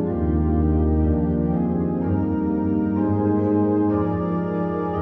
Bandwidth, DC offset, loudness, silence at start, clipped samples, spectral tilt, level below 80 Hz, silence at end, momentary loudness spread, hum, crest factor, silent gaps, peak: 3.3 kHz; under 0.1%; -21 LUFS; 0 s; under 0.1%; -12.5 dB/octave; -30 dBFS; 0 s; 4 LU; none; 12 dB; none; -8 dBFS